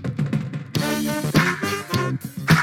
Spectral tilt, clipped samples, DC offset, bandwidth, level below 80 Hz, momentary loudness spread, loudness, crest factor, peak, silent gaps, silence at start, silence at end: -5 dB/octave; under 0.1%; under 0.1%; 18 kHz; -48 dBFS; 8 LU; -23 LUFS; 18 dB; -4 dBFS; none; 0 s; 0 s